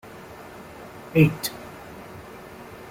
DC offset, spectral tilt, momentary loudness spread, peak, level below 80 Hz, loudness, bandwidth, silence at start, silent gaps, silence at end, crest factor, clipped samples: under 0.1%; -6 dB/octave; 22 LU; -4 dBFS; -54 dBFS; -22 LUFS; 16.5 kHz; 0.05 s; none; 0 s; 22 dB; under 0.1%